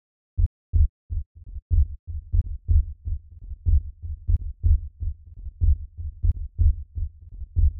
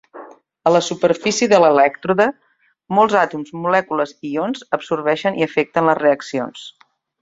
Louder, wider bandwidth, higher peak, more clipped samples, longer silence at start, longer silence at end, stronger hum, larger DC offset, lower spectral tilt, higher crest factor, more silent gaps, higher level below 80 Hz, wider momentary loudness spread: second, -28 LUFS vs -17 LUFS; second, 0.7 kHz vs 7.8 kHz; second, -8 dBFS vs -2 dBFS; neither; first, 0.35 s vs 0.15 s; second, 0 s vs 0.5 s; neither; neither; first, -16 dB/octave vs -4.5 dB/octave; about the same, 16 dB vs 16 dB; first, 0.46-0.73 s, 0.89-1.09 s, 1.26-1.35 s, 1.62-1.70 s, 1.99-2.07 s vs none; first, -26 dBFS vs -62 dBFS; first, 13 LU vs 10 LU